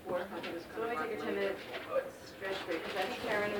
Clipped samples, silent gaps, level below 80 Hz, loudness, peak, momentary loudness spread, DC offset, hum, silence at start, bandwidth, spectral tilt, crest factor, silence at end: under 0.1%; none; -68 dBFS; -38 LUFS; -20 dBFS; 7 LU; under 0.1%; none; 0 s; over 20 kHz; -4.5 dB/octave; 18 dB; 0 s